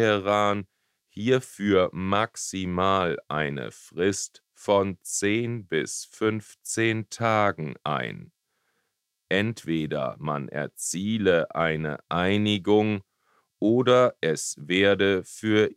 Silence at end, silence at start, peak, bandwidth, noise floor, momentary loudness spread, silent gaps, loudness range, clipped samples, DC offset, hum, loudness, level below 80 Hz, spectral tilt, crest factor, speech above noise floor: 0.05 s; 0 s; -6 dBFS; 15.5 kHz; -78 dBFS; 9 LU; none; 5 LU; under 0.1%; under 0.1%; none; -25 LUFS; -62 dBFS; -4.5 dB/octave; 18 dB; 54 dB